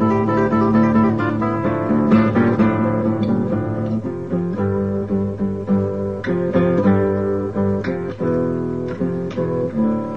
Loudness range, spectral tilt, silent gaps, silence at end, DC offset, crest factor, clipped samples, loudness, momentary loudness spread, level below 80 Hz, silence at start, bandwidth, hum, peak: 4 LU; -10 dB/octave; none; 0 s; 0.6%; 16 dB; under 0.1%; -19 LUFS; 8 LU; -46 dBFS; 0 s; 6.6 kHz; none; -2 dBFS